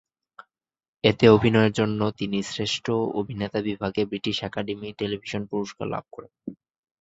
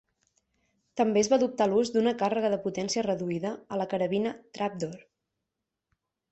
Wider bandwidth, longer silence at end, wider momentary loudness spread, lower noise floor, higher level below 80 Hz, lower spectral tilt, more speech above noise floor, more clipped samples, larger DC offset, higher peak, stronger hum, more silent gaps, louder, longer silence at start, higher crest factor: about the same, 8 kHz vs 8.4 kHz; second, 0.5 s vs 1.35 s; first, 15 LU vs 9 LU; second, -72 dBFS vs -86 dBFS; first, -54 dBFS vs -68 dBFS; about the same, -6 dB/octave vs -5 dB/octave; second, 48 dB vs 58 dB; neither; neither; first, -2 dBFS vs -10 dBFS; neither; neither; first, -24 LUFS vs -28 LUFS; about the same, 1.05 s vs 0.95 s; first, 24 dB vs 18 dB